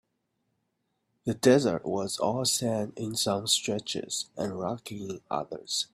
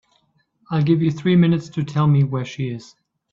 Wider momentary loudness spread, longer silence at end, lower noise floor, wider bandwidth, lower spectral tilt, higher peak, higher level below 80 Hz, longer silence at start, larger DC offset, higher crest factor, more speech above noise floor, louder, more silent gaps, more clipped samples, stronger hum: about the same, 12 LU vs 11 LU; second, 0.1 s vs 0.5 s; first, -78 dBFS vs -64 dBFS; first, 15.5 kHz vs 7.4 kHz; second, -3.5 dB/octave vs -8.5 dB/octave; second, -8 dBFS vs -4 dBFS; second, -66 dBFS vs -58 dBFS; first, 1.25 s vs 0.7 s; neither; first, 22 dB vs 16 dB; first, 49 dB vs 45 dB; second, -29 LUFS vs -19 LUFS; neither; neither; neither